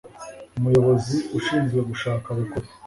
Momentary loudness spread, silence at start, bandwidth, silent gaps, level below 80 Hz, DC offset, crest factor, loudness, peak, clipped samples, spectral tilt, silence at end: 15 LU; 0.05 s; 11.5 kHz; none; -50 dBFS; under 0.1%; 16 dB; -23 LUFS; -8 dBFS; under 0.1%; -7 dB/octave; 0 s